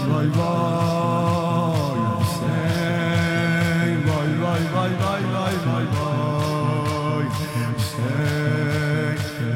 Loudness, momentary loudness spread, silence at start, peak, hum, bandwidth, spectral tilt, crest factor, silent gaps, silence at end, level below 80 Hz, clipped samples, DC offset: -22 LUFS; 3 LU; 0 s; -8 dBFS; none; 16.5 kHz; -6.5 dB/octave; 14 dB; none; 0 s; -50 dBFS; under 0.1%; under 0.1%